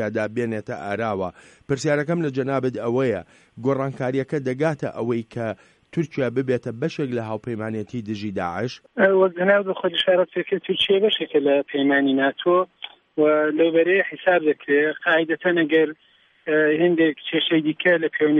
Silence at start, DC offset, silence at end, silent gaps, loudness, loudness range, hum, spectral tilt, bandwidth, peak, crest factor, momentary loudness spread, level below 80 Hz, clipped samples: 0 s; under 0.1%; 0 s; none; -22 LUFS; 6 LU; none; -6 dB/octave; 10 kHz; -6 dBFS; 16 dB; 10 LU; -64 dBFS; under 0.1%